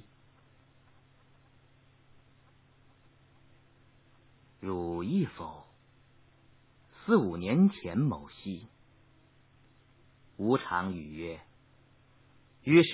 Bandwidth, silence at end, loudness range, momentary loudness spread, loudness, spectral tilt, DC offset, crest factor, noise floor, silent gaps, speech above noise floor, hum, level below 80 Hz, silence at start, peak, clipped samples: 4 kHz; 0 s; 7 LU; 19 LU; -31 LUFS; -6 dB/octave; under 0.1%; 24 dB; -63 dBFS; none; 34 dB; none; -60 dBFS; 4.6 s; -10 dBFS; under 0.1%